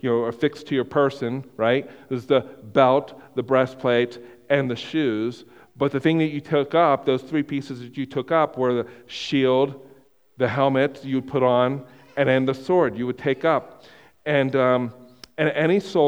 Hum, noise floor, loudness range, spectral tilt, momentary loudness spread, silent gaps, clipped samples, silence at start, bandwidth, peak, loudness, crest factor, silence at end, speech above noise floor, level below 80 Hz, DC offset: none; -54 dBFS; 1 LU; -7 dB/octave; 11 LU; none; under 0.1%; 0.05 s; 10 kHz; -2 dBFS; -22 LUFS; 20 dB; 0 s; 33 dB; -64 dBFS; under 0.1%